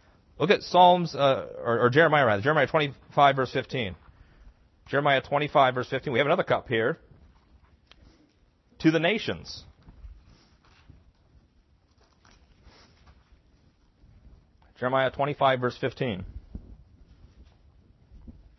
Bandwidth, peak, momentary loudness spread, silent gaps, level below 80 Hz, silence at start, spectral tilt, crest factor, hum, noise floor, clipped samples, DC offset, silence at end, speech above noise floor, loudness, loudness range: 6.2 kHz; -6 dBFS; 15 LU; none; -56 dBFS; 0.4 s; -6.5 dB/octave; 22 dB; none; -64 dBFS; under 0.1%; under 0.1%; 0.25 s; 40 dB; -24 LUFS; 9 LU